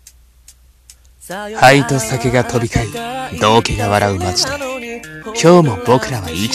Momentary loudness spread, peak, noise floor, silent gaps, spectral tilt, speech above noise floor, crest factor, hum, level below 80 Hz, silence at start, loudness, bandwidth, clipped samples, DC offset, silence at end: 16 LU; 0 dBFS; -46 dBFS; none; -4.5 dB/octave; 32 dB; 16 dB; none; -36 dBFS; 1.25 s; -14 LUFS; 15 kHz; 0.2%; under 0.1%; 0 s